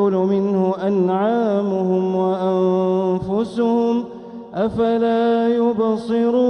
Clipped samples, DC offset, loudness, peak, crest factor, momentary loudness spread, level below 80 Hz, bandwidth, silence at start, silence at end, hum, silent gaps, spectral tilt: under 0.1%; under 0.1%; -19 LUFS; -8 dBFS; 10 dB; 5 LU; -56 dBFS; 9 kHz; 0 s; 0 s; none; none; -8.5 dB/octave